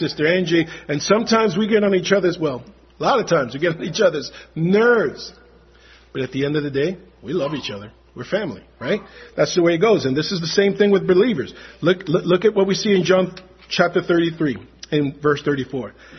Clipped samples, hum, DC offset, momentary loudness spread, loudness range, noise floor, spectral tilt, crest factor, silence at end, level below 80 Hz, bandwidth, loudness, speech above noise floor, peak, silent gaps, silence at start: under 0.1%; none; under 0.1%; 14 LU; 7 LU; -49 dBFS; -5.5 dB/octave; 18 dB; 0 s; -54 dBFS; 6.4 kHz; -19 LUFS; 30 dB; 0 dBFS; none; 0 s